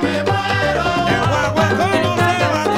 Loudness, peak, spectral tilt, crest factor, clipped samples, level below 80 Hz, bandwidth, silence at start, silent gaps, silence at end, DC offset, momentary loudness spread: -16 LUFS; -2 dBFS; -5.5 dB/octave; 14 dB; under 0.1%; -38 dBFS; 16 kHz; 0 s; none; 0 s; under 0.1%; 2 LU